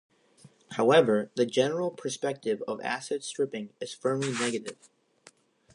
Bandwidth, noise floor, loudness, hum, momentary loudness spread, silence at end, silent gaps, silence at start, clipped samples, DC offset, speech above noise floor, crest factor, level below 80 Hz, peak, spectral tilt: 11 kHz; -60 dBFS; -29 LUFS; none; 14 LU; 1 s; none; 0.7 s; under 0.1%; under 0.1%; 32 dB; 22 dB; -80 dBFS; -8 dBFS; -4.5 dB/octave